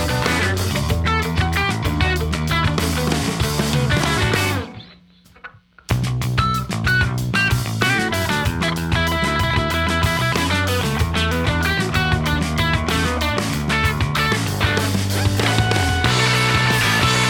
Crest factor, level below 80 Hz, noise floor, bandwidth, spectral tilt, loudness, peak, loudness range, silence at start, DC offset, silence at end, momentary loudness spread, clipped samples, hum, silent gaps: 18 dB; -30 dBFS; -49 dBFS; over 20 kHz; -4.5 dB/octave; -19 LUFS; 0 dBFS; 3 LU; 0 s; under 0.1%; 0 s; 5 LU; under 0.1%; none; none